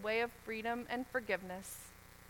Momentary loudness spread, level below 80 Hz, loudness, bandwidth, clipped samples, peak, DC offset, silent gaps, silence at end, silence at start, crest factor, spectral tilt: 12 LU; -66 dBFS; -40 LUFS; 19 kHz; under 0.1%; -22 dBFS; under 0.1%; none; 0 s; 0 s; 20 dB; -3.5 dB/octave